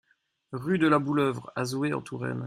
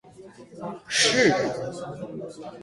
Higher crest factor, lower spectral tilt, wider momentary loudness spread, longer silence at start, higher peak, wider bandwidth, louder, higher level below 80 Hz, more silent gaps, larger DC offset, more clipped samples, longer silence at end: about the same, 20 dB vs 18 dB; first, -6.5 dB/octave vs -2.5 dB/octave; second, 11 LU vs 19 LU; first, 0.5 s vs 0.05 s; about the same, -8 dBFS vs -8 dBFS; first, 15 kHz vs 11.5 kHz; second, -27 LUFS vs -22 LUFS; about the same, -66 dBFS vs -62 dBFS; neither; neither; neither; about the same, 0 s vs 0 s